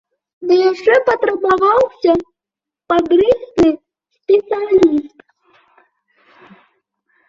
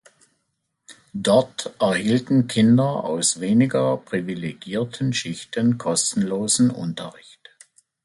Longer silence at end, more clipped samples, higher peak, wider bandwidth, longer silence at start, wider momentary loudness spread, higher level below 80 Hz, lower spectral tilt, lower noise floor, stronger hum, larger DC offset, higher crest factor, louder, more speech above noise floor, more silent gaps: first, 2.2 s vs 0.95 s; neither; about the same, -2 dBFS vs -4 dBFS; second, 7.6 kHz vs 11.5 kHz; second, 0.4 s vs 0.9 s; second, 6 LU vs 12 LU; first, -50 dBFS vs -60 dBFS; first, -6 dB/octave vs -4.5 dB/octave; first, -86 dBFS vs -75 dBFS; neither; neither; about the same, 14 dB vs 18 dB; first, -14 LUFS vs -21 LUFS; first, 73 dB vs 54 dB; neither